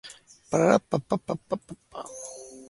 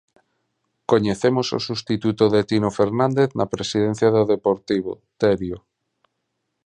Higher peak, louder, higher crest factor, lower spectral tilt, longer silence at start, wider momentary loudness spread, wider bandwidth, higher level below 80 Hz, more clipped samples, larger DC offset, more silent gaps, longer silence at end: about the same, -4 dBFS vs -2 dBFS; second, -26 LUFS vs -20 LUFS; about the same, 24 dB vs 20 dB; about the same, -6 dB/octave vs -6 dB/octave; second, 0.05 s vs 0.9 s; first, 19 LU vs 7 LU; first, 11.5 kHz vs 10 kHz; second, -62 dBFS vs -52 dBFS; neither; neither; neither; second, 0.05 s vs 1.05 s